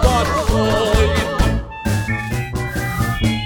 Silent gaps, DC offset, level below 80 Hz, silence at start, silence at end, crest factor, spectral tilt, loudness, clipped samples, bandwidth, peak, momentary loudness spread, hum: none; under 0.1%; -24 dBFS; 0 s; 0 s; 16 dB; -5.5 dB/octave; -19 LUFS; under 0.1%; 18.5 kHz; -2 dBFS; 7 LU; none